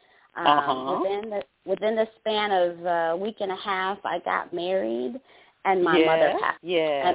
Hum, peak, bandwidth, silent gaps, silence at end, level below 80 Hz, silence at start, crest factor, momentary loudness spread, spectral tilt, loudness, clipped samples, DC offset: none; -6 dBFS; 4 kHz; none; 0 s; -68 dBFS; 0.35 s; 18 dB; 10 LU; -8.5 dB/octave; -25 LUFS; under 0.1%; under 0.1%